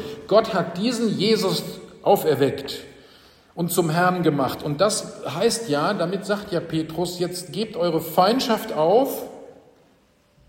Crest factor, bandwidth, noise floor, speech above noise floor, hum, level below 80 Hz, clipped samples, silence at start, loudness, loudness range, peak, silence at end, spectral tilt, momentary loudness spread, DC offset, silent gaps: 18 dB; 16.5 kHz; -59 dBFS; 38 dB; none; -60 dBFS; under 0.1%; 0 s; -22 LUFS; 2 LU; -4 dBFS; 0.95 s; -5 dB/octave; 10 LU; under 0.1%; none